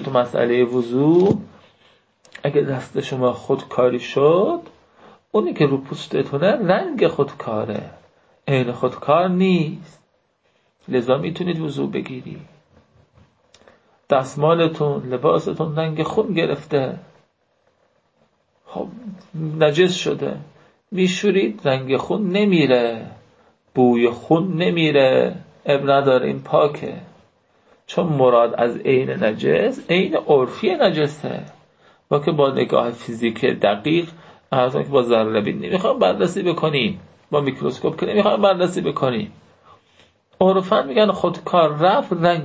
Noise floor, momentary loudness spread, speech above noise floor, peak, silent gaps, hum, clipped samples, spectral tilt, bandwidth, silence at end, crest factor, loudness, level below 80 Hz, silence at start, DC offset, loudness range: -64 dBFS; 12 LU; 46 dB; -2 dBFS; none; none; under 0.1%; -6.5 dB/octave; 8 kHz; 0 s; 18 dB; -19 LUFS; -58 dBFS; 0 s; under 0.1%; 5 LU